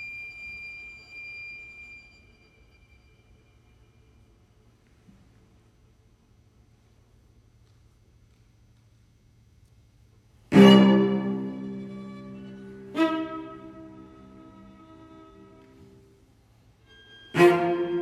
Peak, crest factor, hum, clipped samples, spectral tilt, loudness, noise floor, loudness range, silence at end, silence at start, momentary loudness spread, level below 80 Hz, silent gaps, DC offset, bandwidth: -2 dBFS; 26 dB; none; under 0.1%; -7 dB/octave; -22 LUFS; -60 dBFS; 22 LU; 0 s; 0 s; 28 LU; -62 dBFS; none; under 0.1%; 13 kHz